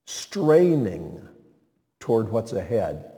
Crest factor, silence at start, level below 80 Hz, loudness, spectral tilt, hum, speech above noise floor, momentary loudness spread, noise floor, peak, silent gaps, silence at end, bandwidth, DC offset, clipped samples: 18 dB; 0.1 s; -56 dBFS; -23 LUFS; -6.5 dB/octave; none; 43 dB; 19 LU; -65 dBFS; -6 dBFS; none; 0.05 s; 17 kHz; under 0.1%; under 0.1%